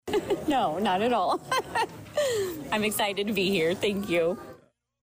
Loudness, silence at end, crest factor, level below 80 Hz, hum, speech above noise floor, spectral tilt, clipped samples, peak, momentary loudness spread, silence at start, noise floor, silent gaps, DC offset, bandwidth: -27 LUFS; 0.45 s; 10 dB; -58 dBFS; none; 30 dB; -4 dB/octave; under 0.1%; -18 dBFS; 5 LU; 0.05 s; -57 dBFS; none; under 0.1%; 16 kHz